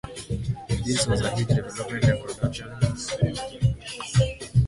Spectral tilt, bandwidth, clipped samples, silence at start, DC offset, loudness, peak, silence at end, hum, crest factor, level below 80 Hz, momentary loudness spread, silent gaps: -5.5 dB/octave; 11.5 kHz; under 0.1%; 0.05 s; under 0.1%; -26 LUFS; -8 dBFS; 0 s; none; 18 dB; -38 dBFS; 7 LU; none